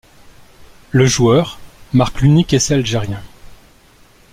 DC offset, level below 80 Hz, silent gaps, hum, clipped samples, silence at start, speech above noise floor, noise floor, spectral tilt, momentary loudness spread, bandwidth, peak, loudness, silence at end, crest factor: under 0.1%; -36 dBFS; none; none; under 0.1%; 0.6 s; 34 dB; -47 dBFS; -5.5 dB/octave; 12 LU; 15.5 kHz; -2 dBFS; -15 LUFS; 0.8 s; 16 dB